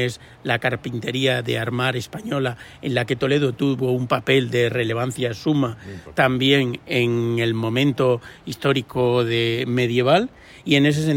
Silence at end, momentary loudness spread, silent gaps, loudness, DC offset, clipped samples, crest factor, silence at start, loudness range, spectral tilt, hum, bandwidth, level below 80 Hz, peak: 0 s; 9 LU; none; -21 LUFS; under 0.1%; under 0.1%; 16 dB; 0 s; 2 LU; -6 dB/octave; none; 16.5 kHz; -54 dBFS; -4 dBFS